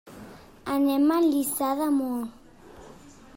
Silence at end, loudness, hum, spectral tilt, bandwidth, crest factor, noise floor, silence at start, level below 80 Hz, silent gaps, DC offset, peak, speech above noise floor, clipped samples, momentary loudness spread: 0.25 s; -25 LUFS; none; -4 dB/octave; 16.5 kHz; 14 dB; -48 dBFS; 0.05 s; -60 dBFS; none; under 0.1%; -14 dBFS; 25 dB; under 0.1%; 18 LU